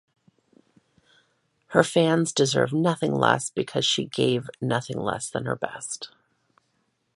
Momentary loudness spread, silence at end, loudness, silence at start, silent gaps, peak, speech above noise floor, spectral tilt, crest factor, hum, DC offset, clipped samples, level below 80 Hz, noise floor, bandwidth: 9 LU; 1.1 s; -24 LUFS; 1.7 s; none; -2 dBFS; 48 dB; -4.5 dB/octave; 24 dB; none; under 0.1%; under 0.1%; -64 dBFS; -72 dBFS; 11.5 kHz